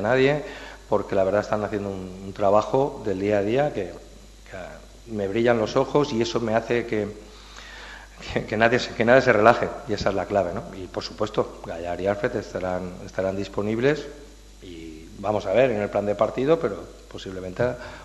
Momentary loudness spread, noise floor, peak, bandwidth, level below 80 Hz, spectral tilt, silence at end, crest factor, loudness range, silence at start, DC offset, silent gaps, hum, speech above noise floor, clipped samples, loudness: 19 LU; -44 dBFS; 0 dBFS; 12 kHz; -46 dBFS; -6 dB/octave; 0 s; 24 dB; 6 LU; 0 s; under 0.1%; none; none; 20 dB; under 0.1%; -24 LUFS